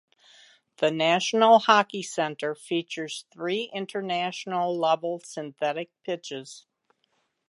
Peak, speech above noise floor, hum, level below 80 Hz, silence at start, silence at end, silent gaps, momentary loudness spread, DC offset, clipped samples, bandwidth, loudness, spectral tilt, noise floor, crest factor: -4 dBFS; 47 dB; none; -84 dBFS; 0.8 s; 0.9 s; none; 16 LU; under 0.1%; under 0.1%; 11.5 kHz; -26 LUFS; -3.5 dB/octave; -73 dBFS; 22 dB